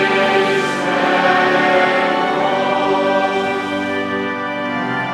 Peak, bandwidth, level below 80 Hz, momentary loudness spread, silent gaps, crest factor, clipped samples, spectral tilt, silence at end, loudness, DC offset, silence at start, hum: -2 dBFS; 13 kHz; -58 dBFS; 7 LU; none; 14 dB; under 0.1%; -4.5 dB/octave; 0 s; -16 LUFS; under 0.1%; 0 s; none